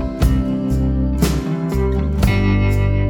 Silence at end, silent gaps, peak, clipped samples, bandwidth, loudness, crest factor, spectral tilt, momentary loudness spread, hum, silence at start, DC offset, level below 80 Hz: 0 s; none; -2 dBFS; under 0.1%; 17.5 kHz; -18 LUFS; 14 dB; -7 dB/octave; 3 LU; none; 0 s; under 0.1%; -20 dBFS